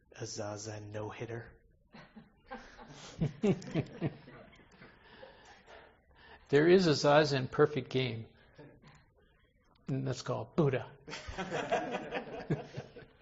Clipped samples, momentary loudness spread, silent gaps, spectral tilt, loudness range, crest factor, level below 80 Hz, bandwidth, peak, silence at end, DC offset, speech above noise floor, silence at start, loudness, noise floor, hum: under 0.1%; 26 LU; none; -6 dB/octave; 10 LU; 24 dB; -62 dBFS; 8 kHz; -12 dBFS; 0.15 s; under 0.1%; 36 dB; 0.15 s; -33 LUFS; -68 dBFS; none